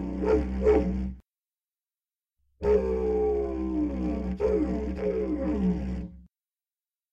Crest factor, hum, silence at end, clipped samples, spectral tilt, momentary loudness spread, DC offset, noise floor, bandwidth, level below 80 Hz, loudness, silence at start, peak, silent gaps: 18 dB; none; 0.9 s; under 0.1%; -9.5 dB/octave; 8 LU; under 0.1%; under -90 dBFS; 7.6 kHz; -38 dBFS; -28 LUFS; 0 s; -10 dBFS; none